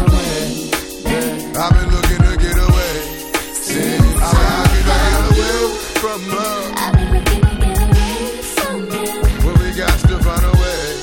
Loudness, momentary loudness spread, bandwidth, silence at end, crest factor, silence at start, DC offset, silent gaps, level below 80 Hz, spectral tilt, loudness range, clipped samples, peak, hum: -16 LUFS; 7 LU; 18 kHz; 0 s; 14 dB; 0 s; under 0.1%; none; -18 dBFS; -5 dB/octave; 2 LU; under 0.1%; 0 dBFS; none